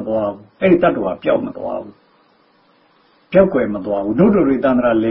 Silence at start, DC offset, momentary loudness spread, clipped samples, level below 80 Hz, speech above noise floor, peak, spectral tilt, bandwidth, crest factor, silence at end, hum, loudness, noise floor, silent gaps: 0 s; under 0.1%; 11 LU; under 0.1%; -46 dBFS; 39 dB; 0 dBFS; -12.5 dB/octave; 5.4 kHz; 16 dB; 0 s; none; -16 LUFS; -55 dBFS; none